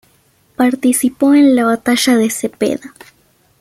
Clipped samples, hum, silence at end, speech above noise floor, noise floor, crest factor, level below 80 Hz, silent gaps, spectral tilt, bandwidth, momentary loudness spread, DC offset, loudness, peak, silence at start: under 0.1%; none; 0.75 s; 42 dB; -54 dBFS; 14 dB; -56 dBFS; none; -3.5 dB/octave; 16 kHz; 9 LU; under 0.1%; -13 LUFS; -2 dBFS; 0.6 s